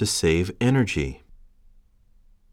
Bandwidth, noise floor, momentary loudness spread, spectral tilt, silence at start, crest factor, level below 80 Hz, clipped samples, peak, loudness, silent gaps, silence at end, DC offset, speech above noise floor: 16.5 kHz; -56 dBFS; 11 LU; -5 dB/octave; 0 s; 16 dB; -42 dBFS; under 0.1%; -10 dBFS; -23 LUFS; none; 1.35 s; under 0.1%; 34 dB